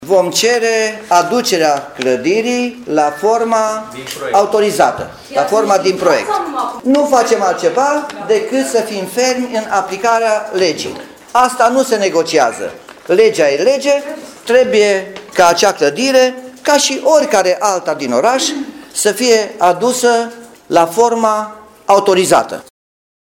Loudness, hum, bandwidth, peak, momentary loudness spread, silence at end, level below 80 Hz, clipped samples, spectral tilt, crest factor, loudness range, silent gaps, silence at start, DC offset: -13 LUFS; none; 17.5 kHz; 0 dBFS; 9 LU; 0.8 s; -56 dBFS; under 0.1%; -3 dB/octave; 14 dB; 3 LU; none; 0 s; under 0.1%